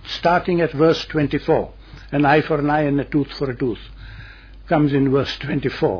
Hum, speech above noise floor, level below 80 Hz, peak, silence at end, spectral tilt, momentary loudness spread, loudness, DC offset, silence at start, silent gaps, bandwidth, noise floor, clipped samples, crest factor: none; 21 dB; -40 dBFS; -4 dBFS; 0 s; -7.5 dB/octave; 15 LU; -19 LUFS; under 0.1%; 0.05 s; none; 5.4 kHz; -39 dBFS; under 0.1%; 16 dB